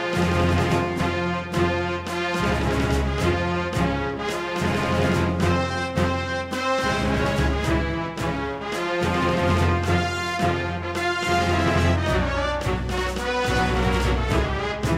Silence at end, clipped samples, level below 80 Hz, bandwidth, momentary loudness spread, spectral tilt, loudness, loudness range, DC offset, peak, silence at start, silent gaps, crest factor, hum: 0 s; under 0.1%; -32 dBFS; 16 kHz; 5 LU; -5.5 dB/octave; -23 LUFS; 2 LU; under 0.1%; -8 dBFS; 0 s; none; 14 dB; none